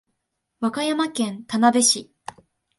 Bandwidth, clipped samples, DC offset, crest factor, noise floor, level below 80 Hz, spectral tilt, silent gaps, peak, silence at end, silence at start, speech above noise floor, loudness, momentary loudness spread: 11.5 kHz; under 0.1%; under 0.1%; 20 dB; -77 dBFS; -68 dBFS; -2.5 dB/octave; none; -4 dBFS; 0.75 s; 0.6 s; 56 dB; -21 LUFS; 24 LU